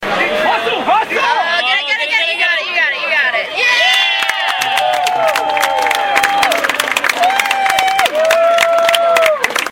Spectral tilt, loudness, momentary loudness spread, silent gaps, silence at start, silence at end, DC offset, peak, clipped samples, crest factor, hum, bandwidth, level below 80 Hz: -0.5 dB/octave; -12 LUFS; 3 LU; none; 0 s; 0 s; under 0.1%; 0 dBFS; under 0.1%; 14 dB; none; 17.5 kHz; -54 dBFS